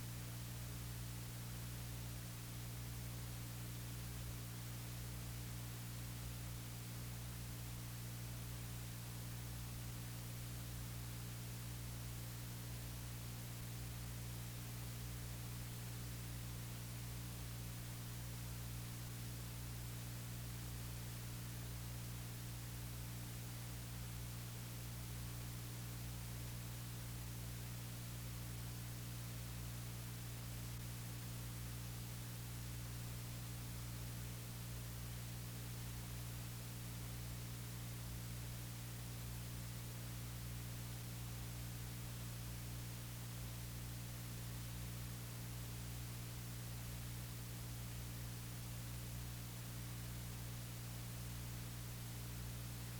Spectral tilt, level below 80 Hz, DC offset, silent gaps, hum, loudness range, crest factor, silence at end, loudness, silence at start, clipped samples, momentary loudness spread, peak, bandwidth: -4 dB/octave; -56 dBFS; under 0.1%; none; 60 Hz at -65 dBFS; 0 LU; 12 dB; 0 s; -49 LUFS; 0 s; under 0.1%; 1 LU; -36 dBFS; over 20 kHz